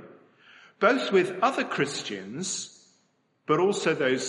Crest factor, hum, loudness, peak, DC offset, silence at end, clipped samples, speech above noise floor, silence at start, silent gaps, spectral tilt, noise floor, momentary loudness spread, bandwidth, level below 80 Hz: 20 dB; none; -26 LUFS; -6 dBFS; under 0.1%; 0 s; under 0.1%; 44 dB; 0 s; none; -4 dB/octave; -69 dBFS; 10 LU; 11.5 kHz; -78 dBFS